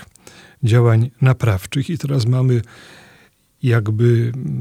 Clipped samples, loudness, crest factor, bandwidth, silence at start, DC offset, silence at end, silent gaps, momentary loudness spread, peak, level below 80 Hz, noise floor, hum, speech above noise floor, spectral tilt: under 0.1%; -17 LUFS; 16 dB; 13.5 kHz; 0.6 s; under 0.1%; 0 s; none; 8 LU; -2 dBFS; -50 dBFS; -53 dBFS; none; 36 dB; -7.5 dB/octave